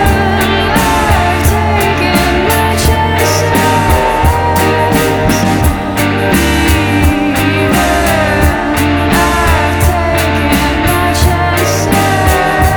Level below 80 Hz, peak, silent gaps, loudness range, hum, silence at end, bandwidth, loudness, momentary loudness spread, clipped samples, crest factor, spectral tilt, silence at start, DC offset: -18 dBFS; 0 dBFS; none; 0 LU; none; 0 s; over 20 kHz; -10 LUFS; 2 LU; under 0.1%; 10 dB; -5 dB/octave; 0 s; under 0.1%